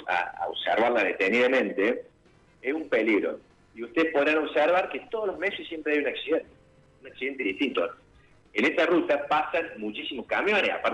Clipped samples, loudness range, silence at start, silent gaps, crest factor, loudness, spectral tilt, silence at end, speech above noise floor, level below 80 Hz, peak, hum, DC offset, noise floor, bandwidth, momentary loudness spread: under 0.1%; 4 LU; 0 s; none; 16 dB; -26 LUFS; -5 dB/octave; 0 s; 33 dB; -66 dBFS; -12 dBFS; none; under 0.1%; -59 dBFS; 11 kHz; 10 LU